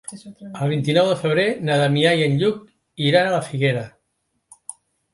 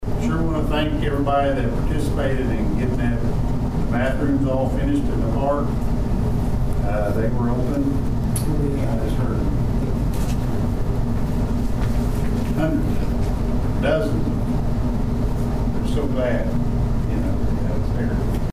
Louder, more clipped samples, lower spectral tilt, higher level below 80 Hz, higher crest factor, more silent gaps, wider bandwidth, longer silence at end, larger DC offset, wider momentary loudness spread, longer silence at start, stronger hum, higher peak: first, -19 LUFS vs -22 LUFS; neither; second, -5.5 dB/octave vs -7.5 dB/octave; second, -62 dBFS vs -24 dBFS; first, 18 dB vs 12 dB; neither; second, 11.5 kHz vs 15.5 kHz; first, 0.4 s vs 0 s; neither; first, 21 LU vs 3 LU; about the same, 0.1 s vs 0 s; neither; first, -2 dBFS vs -8 dBFS